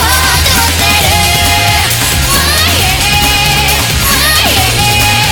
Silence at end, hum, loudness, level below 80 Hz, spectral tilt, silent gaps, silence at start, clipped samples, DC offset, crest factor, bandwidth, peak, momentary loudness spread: 0 s; none; -7 LUFS; -20 dBFS; -2 dB/octave; none; 0 s; 0.2%; 0.3%; 8 dB; over 20 kHz; 0 dBFS; 2 LU